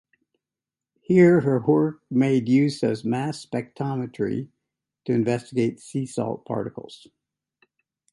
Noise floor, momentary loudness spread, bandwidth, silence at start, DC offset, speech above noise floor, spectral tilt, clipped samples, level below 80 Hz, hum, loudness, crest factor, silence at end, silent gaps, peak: -89 dBFS; 14 LU; 11.5 kHz; 1.1 s; under 0.1%; 67 dB; -7.5 dB/octave; under 0.1%; -64 dBFS; none; -23 LUFS; 20 dB; 1.15 s; none; -4 dBFS